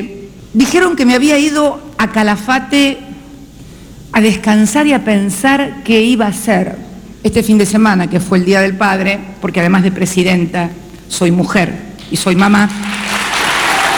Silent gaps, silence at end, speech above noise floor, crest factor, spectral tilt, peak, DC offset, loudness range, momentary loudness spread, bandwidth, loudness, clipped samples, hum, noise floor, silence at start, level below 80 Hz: none; 0 s; 23 dB; 12 dB; -5 dB/octave; 0 dBFS; under 0.1%; 2 LU; 9 LU; over 20 kHz; -12 LUFS; under 0.1%; none; -34 dBFS; 0 s; -40 dBFS